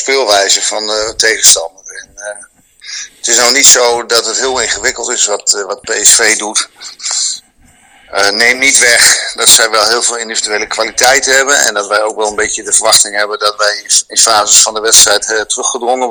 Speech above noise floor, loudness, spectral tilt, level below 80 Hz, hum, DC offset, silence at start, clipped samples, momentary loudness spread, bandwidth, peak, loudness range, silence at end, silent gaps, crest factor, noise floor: 35 dB; -8 LUFS; 1.5 dB/octave; -46 dBFS; none; under 0.1%; 0 s; 2%; 12 LU; over 20 kHz; 0 dBFS; 3 LU; 0 s; none; 10 dB; -45 dBFS